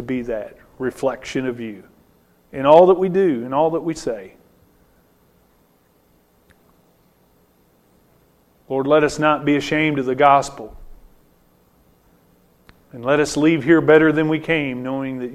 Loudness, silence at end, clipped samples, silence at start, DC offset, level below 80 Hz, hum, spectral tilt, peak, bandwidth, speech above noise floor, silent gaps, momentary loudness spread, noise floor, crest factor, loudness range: -18 LUFS; 0 s; under 0.1%; 0 s; under 0.1%; -50 dBFS; none; -6 dB/octave; 0 dBFS; 13.5 kHz; 41 dB; none; 16 LU; -58 dBFS; 20 dB; 8 LU